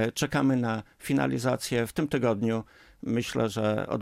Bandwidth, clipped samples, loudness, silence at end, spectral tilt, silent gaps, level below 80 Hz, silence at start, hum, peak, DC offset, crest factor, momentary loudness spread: 16 kHz; under 0.1%; -28 LUFS; 0 s; -5.5 dB/octave; none; -58 dBFS; 0 s; none; -12 dBFS; under 0.1%; 16 dB; 6 LU